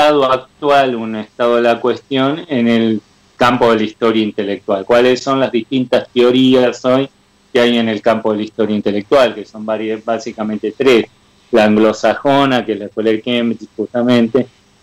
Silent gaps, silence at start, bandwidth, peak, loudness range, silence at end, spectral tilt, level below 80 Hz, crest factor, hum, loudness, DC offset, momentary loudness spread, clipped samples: none; 0 s; 12.5 kHz; -2 dBFS; 2 LU; 0.35 s; -5.5 dB/octave; -52 dBFS; 12 dB; none; -14 LUFS; under 0.1%; 9 LU; under 0.1%